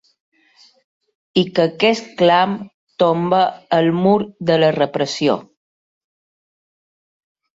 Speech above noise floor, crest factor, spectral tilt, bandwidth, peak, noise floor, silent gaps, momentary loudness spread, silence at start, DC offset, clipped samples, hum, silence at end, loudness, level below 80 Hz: 37 dB; 18 dB; -6 dB/octave; 7.8 kHz; -2 dBFS; -53 dBFS; 2.74-2.87 s; 6 LU; 1.35 s; under 0.1%; under 0.1%; none; 2.15 s; -17 LUFS; -60 dBFS